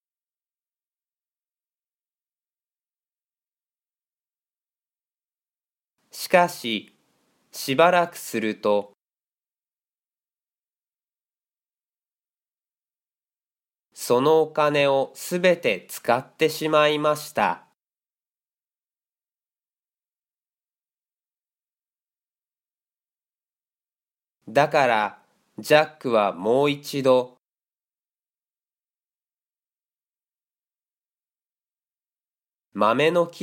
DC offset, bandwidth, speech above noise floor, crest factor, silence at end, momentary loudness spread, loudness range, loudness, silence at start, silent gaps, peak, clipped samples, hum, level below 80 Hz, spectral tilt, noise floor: under 0.1%; 17 kHz; over 69 dB; 26 dB; 0 s; 11 LU; 9 LU; -22 LUFS; 6.15 s; 9.05-9.09 s, 19.79-19.83 s, 28.30-28.34 s; -2 dBFS; under 0.1%; none; -76 dBFS; -4.5 dB/octave; under -90 dBFS